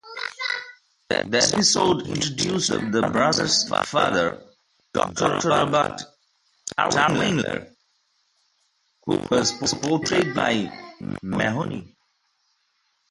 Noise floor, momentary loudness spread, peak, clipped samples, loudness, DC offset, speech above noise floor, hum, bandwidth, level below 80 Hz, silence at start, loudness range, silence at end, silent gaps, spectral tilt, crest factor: -70 dBFS; 14 LU; -4 dBFS; under 0.1%; -22 LUFS; under 0.1%; 48 dB; none; 11.5 kHz; -54 dBFS; 0.05 s; 5 LU; 1.25 s; none; -3.5 dB/octave; 20 dB